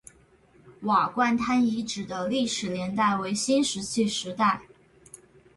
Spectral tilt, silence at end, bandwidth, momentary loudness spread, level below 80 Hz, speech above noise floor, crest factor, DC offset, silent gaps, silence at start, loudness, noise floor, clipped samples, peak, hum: -4 dB/octave; 0.4 s; 11.5 kHz; 7 LU; -62 dBFS; 33 dB; 18 dB; under 0.1%; none; 0.65 s; -26 LUFS; -58 dBFS; under 0.1%; -10 dBFS; none